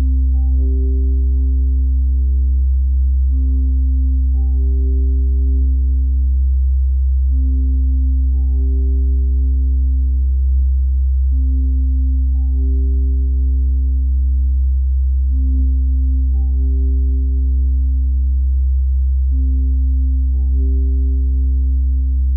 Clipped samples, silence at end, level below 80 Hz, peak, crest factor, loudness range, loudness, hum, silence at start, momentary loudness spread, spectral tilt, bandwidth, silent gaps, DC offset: under 0.1%; 0 s; -14 dBFS; -8 dBFS; 6 dB; 1 LU; -17 LUFS; none; 0 s; 1 LU; -16.5 dB/octave; 0.8 kHz; none; 0.3%